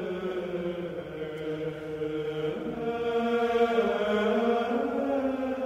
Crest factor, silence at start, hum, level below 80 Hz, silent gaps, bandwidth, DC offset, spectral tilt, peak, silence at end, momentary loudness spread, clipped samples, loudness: 16 dB; 0 s; none; -58 dBFS; none; 10.5 kHz; under 0.1%; -6.5 dB/octave; -12 dBFS; 0 s; 10 LU; under 0.1%; -29 LUFS